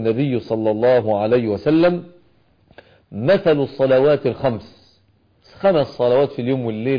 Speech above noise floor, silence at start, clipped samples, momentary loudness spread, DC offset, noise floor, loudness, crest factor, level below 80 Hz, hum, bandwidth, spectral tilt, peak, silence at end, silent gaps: 41 dB; 0 s; under 0.1%; 7 LU; under 0.1%; -58 dBFS; -18 LUFS; 12 dB; -54 dBFS; none; 5.2 kHz; -9 dB/octave; -6 dBFS; 0 s; none